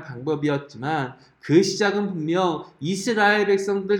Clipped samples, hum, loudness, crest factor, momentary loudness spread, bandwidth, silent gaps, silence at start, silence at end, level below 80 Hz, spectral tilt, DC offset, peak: under 0.1%; none; -22 LUFS; 18 dB; 10 LU; 12.5 kHz; none; 0 s; 0 s; -66 dBFS; -5 dB/octave; under 0.1%; -4 dBFS